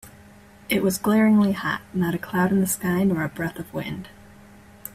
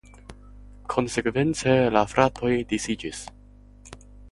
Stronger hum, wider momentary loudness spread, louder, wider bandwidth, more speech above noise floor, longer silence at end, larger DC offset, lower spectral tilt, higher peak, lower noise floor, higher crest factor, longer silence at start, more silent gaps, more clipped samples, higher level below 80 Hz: second, none vs 50 Hz at -45 dBFS; about the same, 14 LU vs 16 LU; about the same, -23 LUFS vs -24 LUFS; first, 16 kHz vs 11.5 kHz; about the same, 26 dB vs 26 dB; about the same, 0.05 s vs 0 s; neither; about the same, -5.5 dB/octave vs -5 dB/octave; second, -8 dBFS vs -4 dBFS; about the same, -48 dBFS vs -49 dBFS; second, 16 dB vs 22 dB; second, 0.05 s vs 0.3 s; neither; neither; second, -54 dBFS vs -48 dBFS